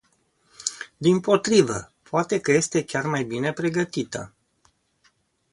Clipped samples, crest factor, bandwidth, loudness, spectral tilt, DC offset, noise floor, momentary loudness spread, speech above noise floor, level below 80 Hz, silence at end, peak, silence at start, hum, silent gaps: under 0.1%; 20 dB; 11.5 kHz; -23 LUFS; -4.5 dB/octave; under 0.1%; -65 dBFS; 12 LU; 43 dB; -60 dBFS; 1.25 s; -4 dBFS; 0.6 s; none; none